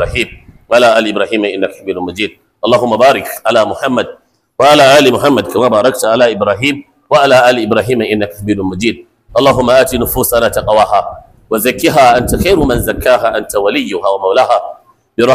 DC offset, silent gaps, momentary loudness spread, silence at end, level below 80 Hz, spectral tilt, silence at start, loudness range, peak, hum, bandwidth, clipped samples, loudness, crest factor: under 0.1%; none; 11 LU; 0 s; -32 dBFS; -4.5 dB/octave; 0 s; 3 LU; 0 dBFS; none; 16 kHz; under 0.1%; -11 LUFS; 10 dB